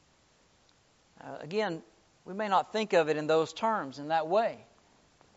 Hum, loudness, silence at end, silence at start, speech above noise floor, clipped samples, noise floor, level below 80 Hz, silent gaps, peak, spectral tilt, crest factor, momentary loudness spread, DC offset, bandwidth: none; -30 LUFS; 0.75 s; 1.25 s; 36 dB; under 0.1%; -66 dBFS; -76 dBFS; none; -12 dBFS; -3 dB/octave; 20 dB; 17 LU; under 0.1%; 8 kHz